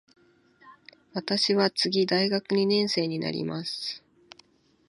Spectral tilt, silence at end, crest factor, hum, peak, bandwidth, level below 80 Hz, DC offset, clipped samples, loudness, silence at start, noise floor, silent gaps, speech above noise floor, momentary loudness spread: -5 dB/octave; 0.9 s; 18 dB; none; -10 dBFS; 11.5 kHz; -74 dBFS; under 0.1%; under 0.1%; -26 LUFS; 0.65 s; -61 dBFS; none; 35 dB; 12 LU